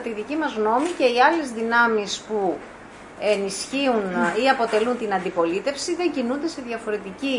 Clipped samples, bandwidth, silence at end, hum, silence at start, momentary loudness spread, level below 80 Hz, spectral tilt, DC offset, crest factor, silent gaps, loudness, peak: under 0.1%; 11 kHz; 0 s; none; 0 s; 9 LU; -60 dBFS; -3.5 dB/octave; under 0.1%; 18 dB; none; -22 LUFS; -4 dBFS